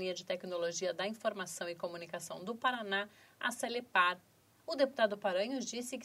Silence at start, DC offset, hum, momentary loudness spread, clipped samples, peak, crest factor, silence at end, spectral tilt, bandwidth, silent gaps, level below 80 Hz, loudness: 0 s; under 0.1%; none; 11 LU; under 0.1%; -16 dBFS; 20 dB; 0 s; -2.5 dB/octave; 16 kHz; none; -86 dBFS; -36 LUFS